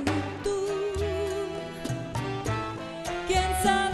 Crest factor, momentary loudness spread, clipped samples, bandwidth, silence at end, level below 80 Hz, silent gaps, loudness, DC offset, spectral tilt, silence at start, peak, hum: 18 dB; 10 LU; under 0.1%; 13 kHz; 0 s; -42 dBFS; none; -29 LUFS; under 0.1%; -4.5 dB/octave; 0 s; -12 dBFS; none